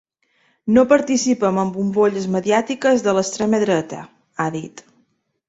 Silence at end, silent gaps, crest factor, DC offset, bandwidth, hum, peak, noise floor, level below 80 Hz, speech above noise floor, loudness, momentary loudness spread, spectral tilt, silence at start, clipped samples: 0.7 s; none; 18 dB; under 0.1%; 8 kHz; none; -2 dBFS; -64 dBFS; -58 dBFS; 47 dB; -18 LUFS; 15 LU; -5 dB/octave; 0.65 s; under 0.1%